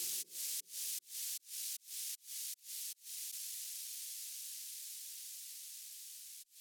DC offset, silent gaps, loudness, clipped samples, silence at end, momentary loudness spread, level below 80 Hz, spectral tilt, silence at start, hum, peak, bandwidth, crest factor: under 0.1%; none; -43 LUFS; under 0.1%; 0 s; 8 LU; under -90 dBFS; 4.5 dB/octave; 0 s; none; -28 dBFS; over 20 kHz; 18 dB